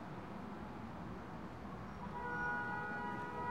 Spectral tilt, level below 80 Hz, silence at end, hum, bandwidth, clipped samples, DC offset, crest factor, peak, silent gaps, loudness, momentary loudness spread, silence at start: -7 dB/octave; -62 dBFS; 0 s; none; 16 kHz; under 0.1%; 0.1%; 14 dB; -30 dBFS; none; -44 LUFS; 9 LU; 0 s